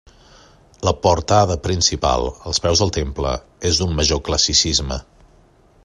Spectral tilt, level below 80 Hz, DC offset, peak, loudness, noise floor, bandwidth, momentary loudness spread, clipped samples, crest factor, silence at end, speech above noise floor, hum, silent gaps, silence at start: -3.5 dB/octave; -32 dBFS; under 0.1%; -2 dBFS; -18 LUFS; -52 dBFS; 11.5 kHz; 9 LU; under 0.1%; 18 dB; 0.85 s; 34 dB; none; none; 0.8 s